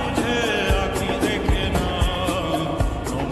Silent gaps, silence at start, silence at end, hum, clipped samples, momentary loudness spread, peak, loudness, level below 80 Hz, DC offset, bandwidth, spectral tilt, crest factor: none; 0 s; 0 s; none; under 0.1%; 4 LU; -6 dBFS; -22 LUFS; -28 dBFS; 0.2%; 13 kHz; -5 dB/octave; 14 dB